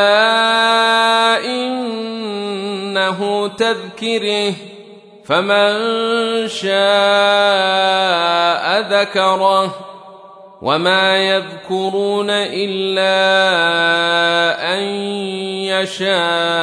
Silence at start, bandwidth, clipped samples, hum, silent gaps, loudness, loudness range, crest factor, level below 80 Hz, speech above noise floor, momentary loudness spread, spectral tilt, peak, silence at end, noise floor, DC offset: 0 s; 11 kHz; under 0.1%; none; none; -15 LUFS; 4 LU; 14 dB; -68 dBFS; 24 dB; 10 LU; -3.5 dB/octave; -2 dBFS; 0 s; -39 dBFS; under 0.1%